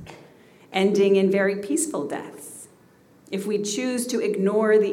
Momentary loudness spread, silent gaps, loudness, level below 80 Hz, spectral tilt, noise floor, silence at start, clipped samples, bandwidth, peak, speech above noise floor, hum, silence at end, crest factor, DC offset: 19 LU; none; -23 LUFS; -70 dBFS; -4.5 dB/octave; -55 dBFS; 0 s; under 0.1%; 15.5 kHz; -8 dBFS; 33 dB; none; 0 s; 16 dB; under 0.1%